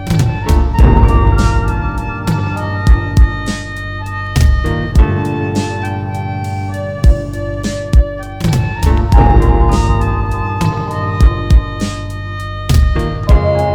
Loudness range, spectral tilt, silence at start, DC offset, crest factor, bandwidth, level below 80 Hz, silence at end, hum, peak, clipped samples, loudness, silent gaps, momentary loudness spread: 3 LU; -7 dB/octave; 0 s; under 0.1%; 12 dB; 13 kHz; -14 dBFS; 0 s; none; 0 dBFS; 0.4%; -14 LUFS; none; 10 LU